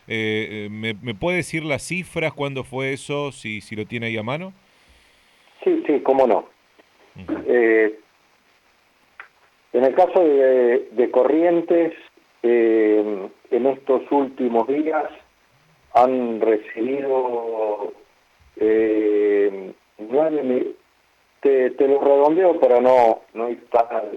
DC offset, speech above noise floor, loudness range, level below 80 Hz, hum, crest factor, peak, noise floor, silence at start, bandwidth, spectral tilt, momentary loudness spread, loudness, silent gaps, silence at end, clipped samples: under 0.1%; 41 dB; 7 LU; -60 dBFS; none; 16 dB; -4 dBFS; -60 dBFS; 0.1 s; 12 kHz; -6 dB/octave; 12 LU; -20 LUFS; none; 0 s; under 0.1%